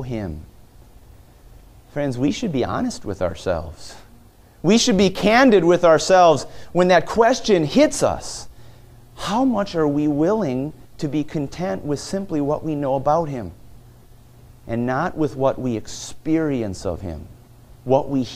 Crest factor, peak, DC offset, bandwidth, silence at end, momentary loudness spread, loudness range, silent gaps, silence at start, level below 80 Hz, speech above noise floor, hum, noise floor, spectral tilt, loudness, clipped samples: 20 dB; 0 dBFS; under 0.1%; 15.5 kHz; 0 s; 17 LU; 10 LU; none; 0 s; -44 dBFS; 29 dB; none; -48 dBFS; -5 dB/octave; -20 LUFS; under 0.1%